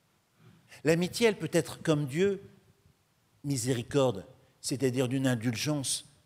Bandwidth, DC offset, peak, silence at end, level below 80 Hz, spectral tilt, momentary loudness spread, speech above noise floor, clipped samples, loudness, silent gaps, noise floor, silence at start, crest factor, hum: 16 kHz; under 0.1%; -12 dBFS; 0.25 s; -66 dBFS; -5 dB/octave; 8 LU; 40 dB; under 0.1%; -30 LUFS; none; -69 dBFS; 0.7 s; 20 dB; none